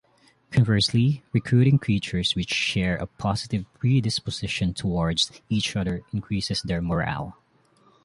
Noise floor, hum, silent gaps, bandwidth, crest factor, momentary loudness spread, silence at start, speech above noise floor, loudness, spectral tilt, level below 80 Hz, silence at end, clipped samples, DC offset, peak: -61 dBFS; none; none; 11.5 kHz; 16 dB; 8 LU; 0.5 s; 37 dB; -24 LUFS; -5.5 dB/octave; -44 dBFS; 0.75 s; under 0.1%; under 0.1%; -8 dBFS